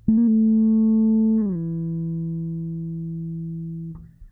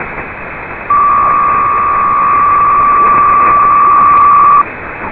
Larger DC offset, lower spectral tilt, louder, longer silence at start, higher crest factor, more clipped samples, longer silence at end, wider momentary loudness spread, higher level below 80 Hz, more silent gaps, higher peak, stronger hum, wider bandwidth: neither; first, -14.5 dB/octave vs -8.5 dB/octave; second, -22 LUFS vs -7 LUFS; about the same, 0.05 s vs 0 s; first, 14 dB vs 8 dB; neither; about the same, 0.05 s vs 0 s; about the same, 14 LU vs 16 LU; second, -48 dBFS vs -36 dBFS; neither; second, -8 dBFS vs 0 dBFS; neither; second, 1.2 kHz vs 4 kHz